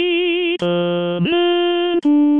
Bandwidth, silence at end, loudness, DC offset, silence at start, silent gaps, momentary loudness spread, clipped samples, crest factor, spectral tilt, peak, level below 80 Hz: 5.6 kHz; 0 s; -17 LUFS; under 0.1%; 0 s; none; 3 LU; under 0.1%; 8 dB; -7.5 dB/octave; -8 dBFS; -62 dBFS